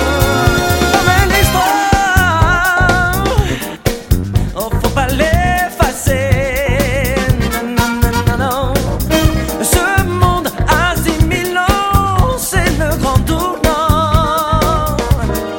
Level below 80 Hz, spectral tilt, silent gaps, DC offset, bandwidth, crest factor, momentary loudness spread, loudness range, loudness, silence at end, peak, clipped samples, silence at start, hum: -20 dBFS; -5 dB/octave; none; under 0.1%; 17 kHz; 12 dB; 5 LU; 3 LU; -13 LUFS; 0 s; 0 dBFS; under 0.1%; 0 s; none